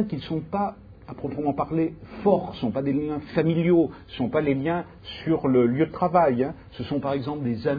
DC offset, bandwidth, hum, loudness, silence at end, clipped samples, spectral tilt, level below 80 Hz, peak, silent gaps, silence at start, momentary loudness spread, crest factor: under 0.1%; 5 kHz; none; -25 LUFS; 0 s; under 0.1%; -10 dB/octave; -52 dBFS; -6 dBFS; none; 0 s; 10 LU; 18 dB